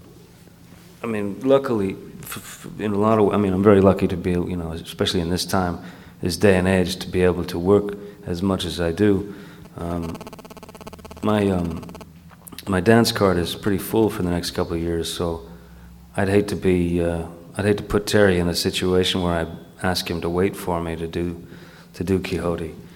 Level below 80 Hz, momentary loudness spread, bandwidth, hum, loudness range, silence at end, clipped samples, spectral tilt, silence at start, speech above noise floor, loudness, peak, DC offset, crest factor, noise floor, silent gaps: -44 dBFS; 17 LU; 17 kHz; none; 5 LU; 0 s; under 0.1%; -5.5 dB/octave; 0.05 s; 26 dB; -21 LUFS; 0 dBFS; under 0.1%; 22 dB; -47 dBFS; none